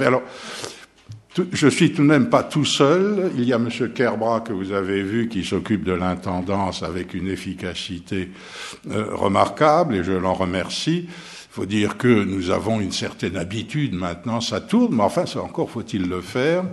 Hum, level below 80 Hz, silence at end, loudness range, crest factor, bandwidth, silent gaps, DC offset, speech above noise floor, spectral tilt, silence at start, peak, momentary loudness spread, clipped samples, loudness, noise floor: none; -52 dBFS; 0 s; 6 LU; 22 dB; 12.5 kHz; none; under 0.1%; 22 dB; -5.5 dB/octave; 0 s; 0 dBFS; 12 LU; under 0.1%; -21 LUFS; -43 dBFS